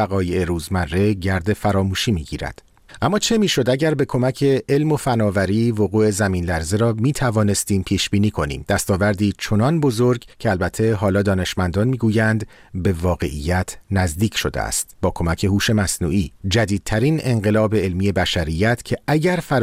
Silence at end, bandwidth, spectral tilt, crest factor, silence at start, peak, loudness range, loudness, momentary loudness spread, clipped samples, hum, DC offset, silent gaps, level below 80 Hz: 0 s; 16 kHz; -5.5 dB/octave; 14 dB; 0 s; -4 dBFS; 2 LU; -19 LUFS; 5 LU; under 0.1%; none; under 0.1%; none; -38 dBFS